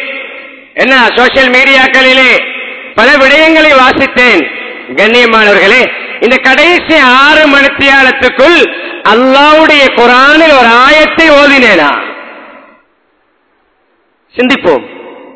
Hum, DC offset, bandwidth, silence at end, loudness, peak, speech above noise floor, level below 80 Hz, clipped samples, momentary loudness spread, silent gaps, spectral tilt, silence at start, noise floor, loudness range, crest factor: none; under 0.1%; 8 kHz; 0.15 s; -4 LUFS; 0 dBFS; 49 dB; -38 dBFS; 9%; 12 LU; none; -3 dB/octave; 0 s; -53 dBFS; 5 LU; 6 dB